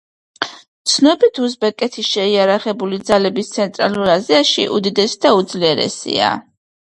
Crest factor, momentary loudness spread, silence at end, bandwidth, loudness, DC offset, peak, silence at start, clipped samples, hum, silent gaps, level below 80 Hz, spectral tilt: 16 dB; 9 LU; 0.45 s; 11.5 kHz; -15 LUFS; under 0.1%; 0 dBFS; 0.4 s; under 0.1%; none; 0.68-0.85 s; -56 dBFS; -3.5 dB/octave